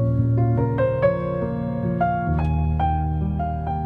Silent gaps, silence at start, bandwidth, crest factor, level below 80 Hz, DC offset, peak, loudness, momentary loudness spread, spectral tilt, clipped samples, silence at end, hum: none; 0 s; 4.2 kHz; 14 dB; -30 dBFS; under 0.1%; -6 dBFS; -22 LUFS; 5 LU; -11 dB/octave; under 0.1%; 0 s; none